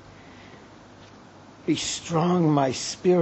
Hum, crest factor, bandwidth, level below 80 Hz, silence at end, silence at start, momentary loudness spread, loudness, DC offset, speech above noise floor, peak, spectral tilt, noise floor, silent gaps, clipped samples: none; 18 dB; 8.4 kHz; -60 dBFS; 0 s; 0.1 s; 25 LU; -24 LUFS; under 0.1%; 26 dB; -8 dBFS; -5.5 dB/octave; -48 dBFS; none; under 0.1%